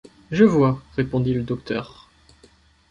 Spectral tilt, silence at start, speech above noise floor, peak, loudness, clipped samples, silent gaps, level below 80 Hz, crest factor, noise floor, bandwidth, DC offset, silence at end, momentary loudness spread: -8.5 dB/octave; 0.3 s; 35 dB; -2 dBFS; -21 LUFS; under 0.1%; none; -48 dBFS; 20 dB; -55 dBFS; 7.4 kHz; under 0.1%; 1.05 s; 13 LU